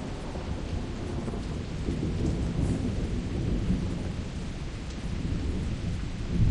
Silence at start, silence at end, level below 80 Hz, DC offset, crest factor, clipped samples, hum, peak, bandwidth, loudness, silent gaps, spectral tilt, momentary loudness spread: 0 s; 0 s; -34 dBFS; under 0.1%; 16 dB; under 0.1%; none; -12 dBFS; 11 kHz; -32 LUFS; none; -7 dB/octave; 7 LU